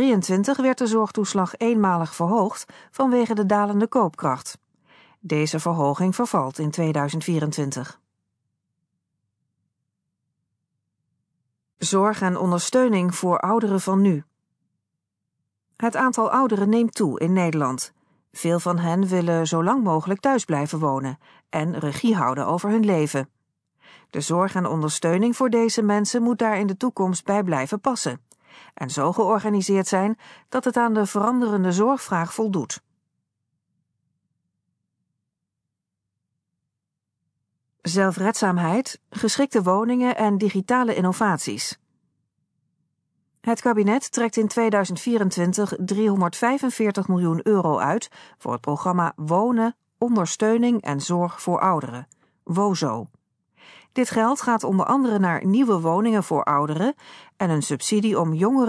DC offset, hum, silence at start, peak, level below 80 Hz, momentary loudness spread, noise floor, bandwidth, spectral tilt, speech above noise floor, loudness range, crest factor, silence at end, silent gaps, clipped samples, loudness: under 0.1%; none; 0 s; -6 dBFS; -72 dBFS; 8 LU; -83 dBFS; 11 kHz; -5.5 dB/octave; 61 dB; 4 LU; 16 dB; 0 s; none; under 0.1%; -22 LUFS